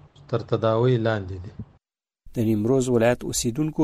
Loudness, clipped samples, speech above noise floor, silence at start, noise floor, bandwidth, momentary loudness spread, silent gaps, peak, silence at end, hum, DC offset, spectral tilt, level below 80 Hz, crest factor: -23 LUFS; under 0.1%; 48 dB; 0.3 s; -70 dBFS; 15.5 kHz; 15 LU; none; -8 dBFS; 0 s; none; under 0.1%; -6 dB/octave; -48 dBFS; 16 dB